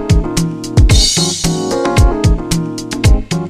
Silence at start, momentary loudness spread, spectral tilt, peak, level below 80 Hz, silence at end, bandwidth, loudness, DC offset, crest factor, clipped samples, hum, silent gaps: 0 s; 8 LU; -4.5 dB/octave; 0 dBFS; -16 dBFS; 0 s; 15 kHz; -13 LUFS; under 0.1%; 12 dB; under 0.1%; none; none